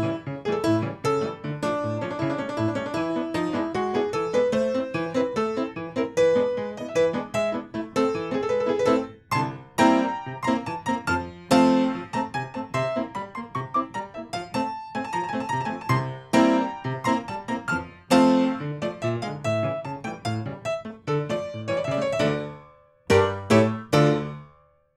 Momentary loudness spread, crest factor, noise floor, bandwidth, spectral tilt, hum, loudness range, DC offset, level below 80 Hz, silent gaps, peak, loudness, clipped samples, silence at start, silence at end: 10 LU; 20 dB; -57 dBFS; 13.5 kHz; -6 dB/octave; none; 5 LU; under 0.1%; -58 dBFS; none; -4 dBFS; -25 LUFS; under 0.1%; 0 s; 0.5 s